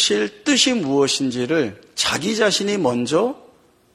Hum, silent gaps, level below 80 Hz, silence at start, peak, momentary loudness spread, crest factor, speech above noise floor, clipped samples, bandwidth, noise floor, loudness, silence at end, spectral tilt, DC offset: none; none; -58 dBFS; 0 s; -4 dBFS; 6 LU; 16 dB; 33 dB; under 0.1%; 14 kHz; -52 dBFS; -19 LUFS; 0.6 s; -3 dB/octave; under 0.1%